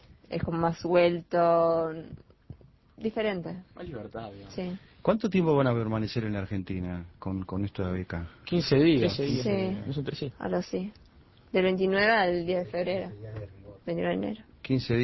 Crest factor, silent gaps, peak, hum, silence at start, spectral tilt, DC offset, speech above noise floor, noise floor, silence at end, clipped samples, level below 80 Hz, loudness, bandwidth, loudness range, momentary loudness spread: 18 dB; none; -10 dBFS; none; 0.3 s; -7.5 dB/octave; under 0.1%; 23 dB; -50 dBFS; 0 s; under 0.1%; -52 dBFS; -28 LUFS; 6 kHz; 3 LU; 17 LU